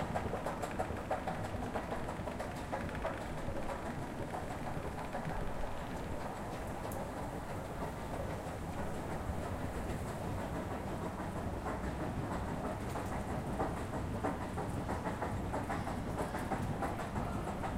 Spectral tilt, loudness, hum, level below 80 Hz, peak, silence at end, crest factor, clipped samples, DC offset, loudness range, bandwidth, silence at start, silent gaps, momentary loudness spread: -6.5 dB/octave; -40 LUFS; none; -48 dBFS; -22 dBFS; 0 s; 16 dB; under 0.1%; under 0.1%; 3 LU; 16 kHz; 0 s; none; 4 LU